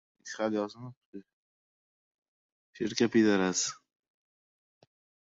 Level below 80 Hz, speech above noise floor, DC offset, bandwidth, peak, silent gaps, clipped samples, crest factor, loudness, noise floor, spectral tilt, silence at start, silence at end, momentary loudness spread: -74 dBFS; over 60 dB; under 0.1%; 8 kHz; -14 dBFS; 0.97-1.13 s, 1.33-2.22 s, 2.28-2.73 s; under 0.1%; 20 dB; -29 LUFS; under -90 dBFS; -4 dB/octave; 0.25 s; 1.55 s; 25 LU